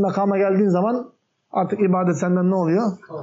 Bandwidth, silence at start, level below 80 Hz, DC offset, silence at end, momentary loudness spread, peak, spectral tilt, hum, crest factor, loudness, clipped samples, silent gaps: 7.6 kHz; 0 s; -72 dBFS; under 0.1%; 0 s; 8 LU; -8 dBFS; -9 dB/octave; none; 10 dB; -20 LUFS; under 0.1%; none